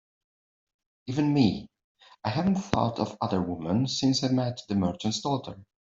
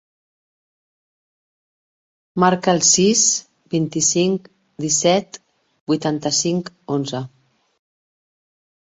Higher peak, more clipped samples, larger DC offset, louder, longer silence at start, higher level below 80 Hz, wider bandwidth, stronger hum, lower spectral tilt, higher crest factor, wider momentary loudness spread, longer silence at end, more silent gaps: about the same, -4 dBFS vs -2 dBFS; neither; neither; second, -27 LUFS vs -18 LUFS; second, 1.05 s vs 2.35 s; about the same, -58 dBFS vs -62 dBFS; about the same, 7.8 kHz vs 8.2 kHz; neither; first, -6 dB/octave vs -3.5 dB/octave; about the same, 24 dB vs 20 dB; second, 9 LU vs 15 LU; second, 0.25 s vs 1.6 s; about the same, 1.84-1.95 s vs 5.81-5.87 s